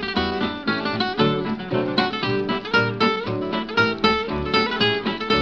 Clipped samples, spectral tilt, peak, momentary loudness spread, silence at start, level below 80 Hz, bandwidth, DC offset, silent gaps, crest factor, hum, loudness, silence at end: under 0.1%; -6 dB/octave; -2 dBFS; 6 LU; 0 s; -44 dBFS; 7.8 kHz; under 0.1%; none; 20 dB; none; -22 LUFS; 0 s